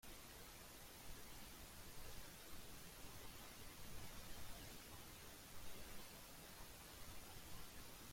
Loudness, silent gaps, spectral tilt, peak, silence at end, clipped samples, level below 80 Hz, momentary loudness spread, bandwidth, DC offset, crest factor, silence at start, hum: -57 LUFS; none; -2.5 dB/octave; -40 dBFS; 0 s; under 0.1%; -64 dBFS; 2 LU; 16.5 kHz; under 0.1%; 16 dB; 0.05 s; none